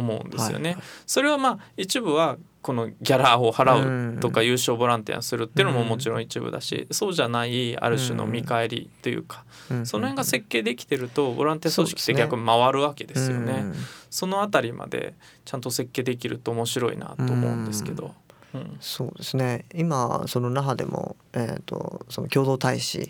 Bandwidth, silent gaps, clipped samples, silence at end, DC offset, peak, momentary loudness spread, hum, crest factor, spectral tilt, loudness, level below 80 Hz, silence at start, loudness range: 19.5 kHz; none; under 0.1%; 0 s; under 0.1%; -4 dBFS; 12 LU; none; 22 dB; -4.5 dB/octave; -25 LUFS; -64 dBFS; 0 s; 6 LU